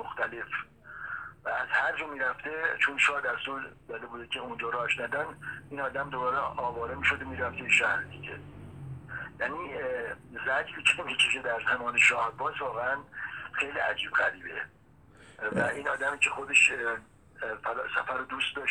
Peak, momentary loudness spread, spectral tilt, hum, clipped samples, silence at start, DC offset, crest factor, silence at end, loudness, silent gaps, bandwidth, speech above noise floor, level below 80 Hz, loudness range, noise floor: -8 dBFS; 16 LU; -2 dB/octave; none; under 0.1%; 0 s; under 0.1%; 22 dB; 0 s; -29 LUFS; none; 13.5 kHz; 26 dB; -60 dBFS; 5 LU; -56 dBFS